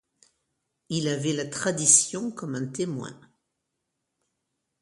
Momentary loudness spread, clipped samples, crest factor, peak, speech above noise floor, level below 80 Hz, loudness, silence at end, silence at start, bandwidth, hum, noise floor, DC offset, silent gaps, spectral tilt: 15 LU; under 0.1%; 24 dB; -4 dBFS; 55 dB; -70 dBFS; -24 LUFS; 1.65 s; 0.9 s; 11.5 kHz; none; -81 dBFS; under 0.1%; none; -3 dB/octave